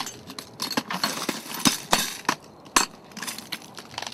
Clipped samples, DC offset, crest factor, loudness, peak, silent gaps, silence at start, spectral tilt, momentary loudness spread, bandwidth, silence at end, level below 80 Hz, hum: under 0.1%; under 0.1%; 28 dB; -26 LUFS; 0 dBFS; none; 0 s; -1.5 dB/octave; 13 LU; 16 kHz; 0 s; -58 dBFS; none